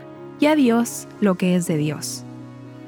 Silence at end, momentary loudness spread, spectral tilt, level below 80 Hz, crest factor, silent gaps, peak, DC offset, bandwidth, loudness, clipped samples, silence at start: 0 s; 21 LU; -5.5 dB/octave; -66 dBFS; 16 dB; none; -6 dBFS; under 0.1%; over 20 kHz; -20 LUFS; under 0.1%; 0 s